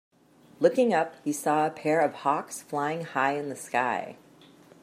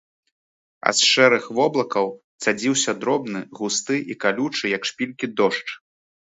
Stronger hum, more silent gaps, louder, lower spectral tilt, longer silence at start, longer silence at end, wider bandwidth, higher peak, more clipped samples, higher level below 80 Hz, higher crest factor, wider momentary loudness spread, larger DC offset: neither; second, none vs 2.24-2.39 s; second, -27 LUFS vs -21 LUFS; first, -5 dB/octave vs -2.5 dB/octave; second, 0.6 s vs 0.85 s; first, 0.7 s vs 0.55 s; first, 15.5 kHz vs 8.2 kHz; second, -8 dBFS vs 0 dBFS; neither; second, -78 dBFS vs -72 dBFS; about the same, 20 dB vs 22 dB; second, 8 LU vs 12 LU; neither